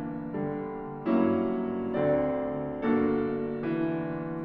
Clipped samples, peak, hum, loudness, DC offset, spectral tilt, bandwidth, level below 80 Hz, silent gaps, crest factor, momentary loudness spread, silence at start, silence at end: under 0.1%; -14 dBFS; none; -29 LUFS; under 0.1%; -10.5 dB/octave; 4.7 kHz; -56 dBFS; none; 16 dB; 8 LU; 0 s; 0 s